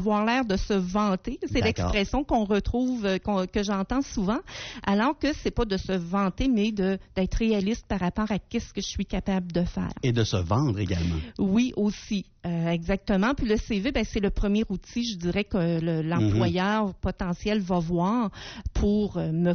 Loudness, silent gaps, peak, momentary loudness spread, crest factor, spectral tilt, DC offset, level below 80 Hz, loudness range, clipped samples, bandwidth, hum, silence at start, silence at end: -27 LUFS; none; -12 dBFS; 6 LU; 12 dB; -5.5 dB/octave; under 0.1%; -38 dBFS; 1 LU; under 0.1%; 6.6 kHz; none; 0 s; 0 s